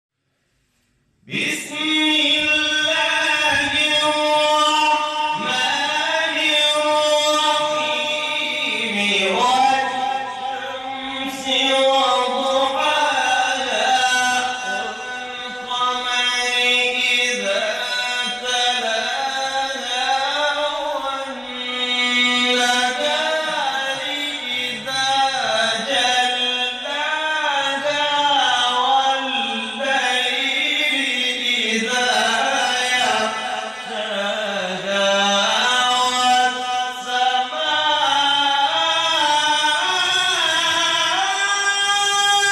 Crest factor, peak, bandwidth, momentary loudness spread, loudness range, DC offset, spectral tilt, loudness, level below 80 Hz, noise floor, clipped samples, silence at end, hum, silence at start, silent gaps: 12 dB; -6 dBFS; 13 kHz; 7 LU; 3 LU; under 0.1%; -0.5 dB/octave; -18 LUFS; -62 dBFS; -68 dBFS; under 0.1%; 0 s; none; 1.25 s; none